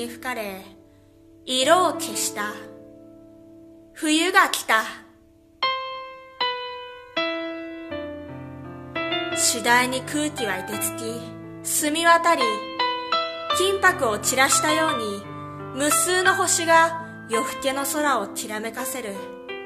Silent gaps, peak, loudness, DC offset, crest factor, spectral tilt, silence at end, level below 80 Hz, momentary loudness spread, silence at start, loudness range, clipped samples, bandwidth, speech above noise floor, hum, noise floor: none; 0 dBFS; -22 LUFS; under 0.1%; 24 dB; -1.5 dB/octave; 0 s; -62 dBFS; 18 LU; 0 s; 8 LU; under 0.1%; 14 kHz; 32 dB; none; -54 dBFS